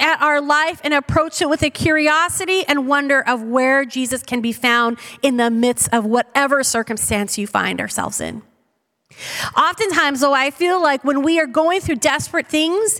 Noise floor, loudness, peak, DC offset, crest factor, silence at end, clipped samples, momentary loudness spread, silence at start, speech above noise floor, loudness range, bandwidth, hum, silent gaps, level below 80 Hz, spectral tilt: -67 dBFS; -17 LUFS; -2 dBFS; under 0.1%; 16 dB; 0 s; under 0.1%; 6 LU; 0 s; 50 dB; 4 LU; 18.5 kHz; none; none; -46 dBFS; -3 dB/octave